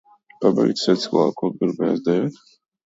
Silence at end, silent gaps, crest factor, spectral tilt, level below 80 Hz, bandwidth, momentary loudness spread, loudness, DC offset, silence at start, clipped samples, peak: 0.55 s; none; 18 dB; -6.5 dB/octave; -66 dBFS; 8 kHz; 5 LU; -21 LUFS; under 0.1%; 0.4 s; under 0.1%; -4 dBFS